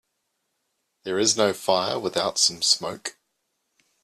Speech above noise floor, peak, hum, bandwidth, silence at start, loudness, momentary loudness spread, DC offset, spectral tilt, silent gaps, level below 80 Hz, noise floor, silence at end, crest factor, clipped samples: 53 dB; -4 dBFS; none; 14 kHz; 1.05 s; -22 LUFS; 14 LU; under 0.1%; -1.5 dB/octave; none; -68 dBFS; -76 dBFS; 0.9 s; 22 dB; under 0.1%